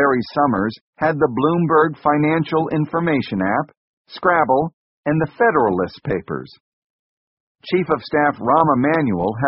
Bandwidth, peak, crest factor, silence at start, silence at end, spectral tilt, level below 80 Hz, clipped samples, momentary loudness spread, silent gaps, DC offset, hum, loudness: 5.8 kHz; -2 dBFS; 18 dB; 0 s; 0 s; -6 dB/octave; -52 dBFS; under 0.1%; 10 LU; 0.81-0.93 s, 3.77-4.05 s, 4.73-5.03 s, 6.60-7.55 s; under 0.1%; none; -18 LUFS